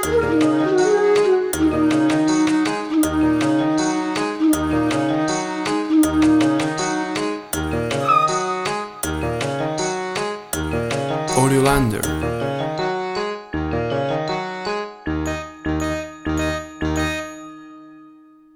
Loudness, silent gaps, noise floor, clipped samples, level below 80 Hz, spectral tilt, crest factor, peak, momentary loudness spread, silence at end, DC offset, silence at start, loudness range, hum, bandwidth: -20 LUFS; none; -47 dBFS; under 0.1%; -38 dBFS; -5 dB/octave; 18 dB; -2 dBFS; 9 LU; 0.45 s; under 0.1%; 0 s; 7 LU; none; over 20 kHz